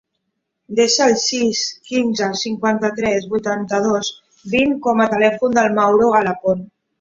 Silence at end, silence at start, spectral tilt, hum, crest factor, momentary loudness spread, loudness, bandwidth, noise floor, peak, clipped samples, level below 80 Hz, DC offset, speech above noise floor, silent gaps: 0.35 s; 0.7 s; -3.5 dB/octave; none; 16 dB; 7 LU; -17 LUFS; 7.8 kHz; -74 dBFS; -2 dBFS; under 0.1%; -56 dBFS; under 0.1%; 57 dB; none